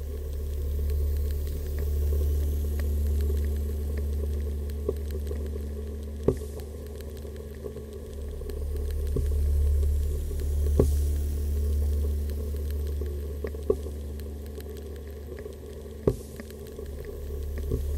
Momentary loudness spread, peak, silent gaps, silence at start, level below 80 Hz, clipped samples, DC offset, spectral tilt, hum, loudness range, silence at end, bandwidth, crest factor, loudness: 12 LU; -6 dBFS; none; 0 s; -30 dBFS; under 0.1%; under 0.1%; -7.5 dB/octave; none; 7 LU; 0 s; 16 kHz; 22 dB; -31 LUFS